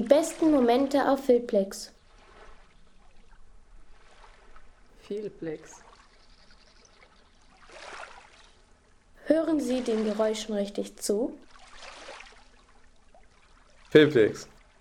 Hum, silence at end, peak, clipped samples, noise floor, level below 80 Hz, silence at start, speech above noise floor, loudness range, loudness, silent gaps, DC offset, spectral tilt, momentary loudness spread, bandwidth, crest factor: none; 0.35 s; -6 dBFS; under 0.1%; -59 dBFS; -58 dBFS; 0 s; 34 dB; 18 LU; -26 LUFS; none; under 0.1%; -5 dB/octave; 24 LU; 17.5 kHz; 24 dB